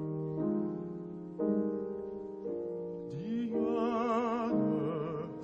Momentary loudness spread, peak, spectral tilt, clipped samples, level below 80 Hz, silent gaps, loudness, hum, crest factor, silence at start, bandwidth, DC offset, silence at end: 10 LU; -20 dBFS; -9 dB/octave; under 0.1%; -68 dBFS; none; -35 LUFS; none; 14 dB; 0 s; 7.6 kHz; under 0.1%; 0 s